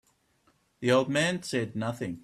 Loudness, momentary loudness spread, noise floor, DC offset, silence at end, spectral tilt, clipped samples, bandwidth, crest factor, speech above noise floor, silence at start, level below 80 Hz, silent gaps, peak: -28 LUFS; 9 LU; -69 dBFS; under 0.1%; 0.05 s; -5 dB/octave; under 0.1%; 13.5 kHz; 20 dB; 41 dB; 0.8 s; -66 dBFS; none; -10 dBFS